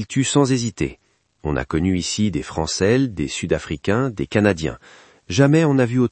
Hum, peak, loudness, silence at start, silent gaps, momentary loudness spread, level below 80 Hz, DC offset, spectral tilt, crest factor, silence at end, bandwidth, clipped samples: none; 0 dBFS; -20 LUFS; 0 s; none; 10 LU; -42 dBFS; under 0.1%; -5.5 dB/octave; 20 dB; 0.05 s; 8.8 kHz; under 0.1%